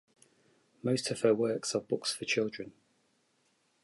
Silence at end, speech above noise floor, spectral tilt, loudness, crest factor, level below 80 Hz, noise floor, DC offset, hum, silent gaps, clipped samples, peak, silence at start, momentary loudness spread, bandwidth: 1.1 s; 42 dB; -4 dB/octave; -32 LUFS; 20 dB; -76 dBFS; -74 dBFS; under 0.1%; none; none; under 0.1%; -14 dBFS; 0.85 s; 10 LU; 11.5 kHz